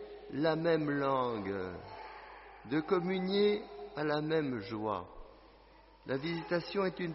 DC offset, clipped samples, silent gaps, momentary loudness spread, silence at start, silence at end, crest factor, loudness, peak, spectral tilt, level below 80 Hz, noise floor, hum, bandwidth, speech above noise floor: under 0.1%; under 0.1%; none; 17 LU; 0 s; 0 s; 18 dB; -34 LUFS; -18 dBFS; -4.5 dB/octave; -64 dBFS; -60 dBFS; none; 5.8 kHz; 26 dB